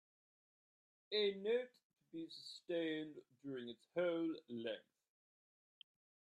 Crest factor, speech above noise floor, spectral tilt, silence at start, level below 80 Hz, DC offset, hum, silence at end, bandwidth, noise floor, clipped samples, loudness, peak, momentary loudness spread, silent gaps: 18 dB; over 47 dB; -5.5 dB/octave; 1.1 s; under -90 dBFS; under 0.1%; none; 1.4 s; 10.5 kHz; under -90 dBFS; under 0.1%; -44 LUFS; -28 dBFS; 14 LU; 1.83-1.90 s